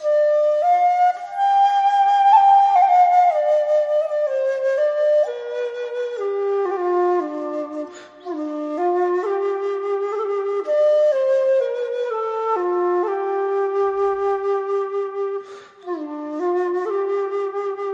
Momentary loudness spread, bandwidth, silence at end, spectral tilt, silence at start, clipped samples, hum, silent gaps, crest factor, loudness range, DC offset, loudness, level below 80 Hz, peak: 13 LU; 7.8 kHz; 0 s; -4 dB/octave; 0 s; under 0.1%; none; none; 16 dB; 8 LU; under 0.1%; -19 LUFS; -70 dBFS; -4 dBFS